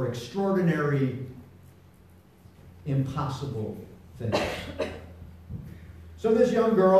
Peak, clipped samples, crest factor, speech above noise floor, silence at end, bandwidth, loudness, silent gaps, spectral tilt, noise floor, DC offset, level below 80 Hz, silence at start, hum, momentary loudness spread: -10 dBFS; under 0.1%; 18 dB; 29 dB; 0 s; 14 kHz; -27 LUFS; none; -7.5 dB/octave; -54 dBFS; under 0.1%; -52 dBFS; 0 s; none; 24 LU